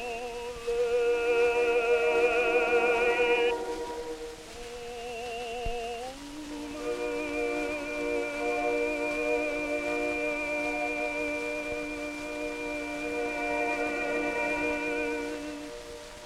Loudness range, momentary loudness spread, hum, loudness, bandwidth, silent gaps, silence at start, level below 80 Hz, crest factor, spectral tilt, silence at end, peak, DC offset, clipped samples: 9 LU; 14 LU; none; -29 LUFS; 14 kHz; none; 0 s; -50 dBFS; 16 dB; -3.5 dB/octave; 0 s; -14 dBFS; under 0.1%; under 0.1%